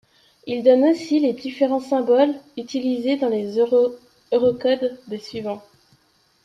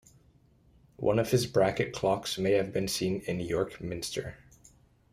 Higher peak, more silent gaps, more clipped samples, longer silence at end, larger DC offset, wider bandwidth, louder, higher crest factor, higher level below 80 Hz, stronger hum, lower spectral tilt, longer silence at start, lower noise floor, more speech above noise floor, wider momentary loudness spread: first, -4 dBFS vs -12 dBFS; neither; neither; about the same, 0.85 s vs 0.75 s; neither; second, 9.8 kHz vs 15.5 kHz; first, -20 LUFS vs -30 LUFS; about the same, 18 dB vs 18 dB; second, -66 dBFS vs -56 dBFS; neither; about the same, -6 dB/octave vs -5 dB/octave; second, 0.45 s vs 1 s; about the same, -61 dBFS vs -63 dBFS; first, 41 dB vs 33 dB; first, 14 LU vs 9 LU